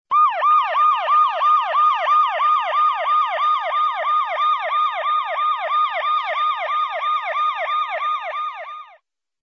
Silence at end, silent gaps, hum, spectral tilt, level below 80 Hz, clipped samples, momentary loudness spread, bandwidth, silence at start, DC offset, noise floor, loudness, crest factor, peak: 0.55 s; none; none; 1.5 dB/octave; -76 dBFS; under 0.1%; 7 LU; 6.4 kHz; 0.1 s; under 0.1%; -56 dBFS; -18 LUFS; 10 dB; -8 dBFS